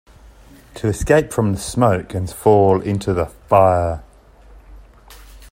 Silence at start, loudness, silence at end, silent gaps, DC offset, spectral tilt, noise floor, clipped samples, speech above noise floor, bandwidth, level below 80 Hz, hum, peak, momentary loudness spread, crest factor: 0.75 s; -17 LUFS; 0.05 s; none; under 0.1%; -6.5 dB/octave; -45 dBFS; under 0.1%; 29 dB; 16 kHz; -38 dBFS; none; 0 dBFS; 10 LU; 18 dB